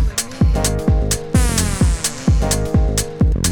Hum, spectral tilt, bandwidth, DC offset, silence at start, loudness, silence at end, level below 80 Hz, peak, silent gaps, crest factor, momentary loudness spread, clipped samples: none; -4.5 dB/octave; 19 kHz; under 0.1%; 0 s; -17 LUFS; 0 s; -20 dBFS; -2 dBFS; none; 14 dB; 2 LU; under 0.1%